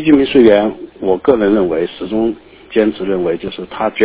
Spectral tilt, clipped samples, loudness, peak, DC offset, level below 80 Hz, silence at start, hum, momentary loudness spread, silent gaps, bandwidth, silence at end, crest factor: -10.5 dB/octave; 0.4%; -14 LUFS; 0 dBFS; under 0.1%; -44 dBFS; 0 s; none; 12 LU; none; 4 kHz; 0 s; 14 dB